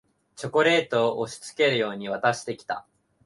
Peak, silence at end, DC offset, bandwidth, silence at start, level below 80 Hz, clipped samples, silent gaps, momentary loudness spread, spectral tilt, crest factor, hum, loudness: -8 dBFS; 0.45 s; under 0.1%; 11.5 kHz; 0.4 s; -68 dBFS; under 0.1%; none; 13 LU; -4 dB/octave; 18 dB; none; -25 LUFS